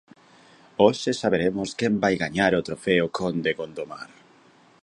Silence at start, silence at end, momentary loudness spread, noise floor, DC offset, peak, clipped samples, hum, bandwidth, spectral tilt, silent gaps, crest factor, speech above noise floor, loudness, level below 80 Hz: 0.8 s; 0.75 s; 15 LU; -56 dBFS; under 0.1%; -4 dBFS; under 0.1%; none; 11 kHz; -5.5 dB/octave; none; 22 dB; 32 dB; -23 LUFS; -56 dBFS